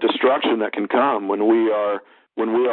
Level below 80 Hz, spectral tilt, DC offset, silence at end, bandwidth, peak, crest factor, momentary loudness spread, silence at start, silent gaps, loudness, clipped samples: -68 dBFS; -9.5 dB/octave; under 0.1%; 0 s; 4.2 kHz; -6 dBFS; 14 dB; 8 LU; 0 s; none; -20 LUFS; under 0.1%